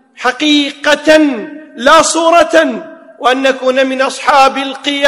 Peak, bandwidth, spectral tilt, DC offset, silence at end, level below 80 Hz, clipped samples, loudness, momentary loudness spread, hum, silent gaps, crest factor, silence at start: 0 dBFS; 15.5 kHz; -1.5 dB/octave; under 0.1%; 0 s; -50 dBFS; 2%; -10 LUFS; 9 LU; none; none; 10 dB; 0.2 s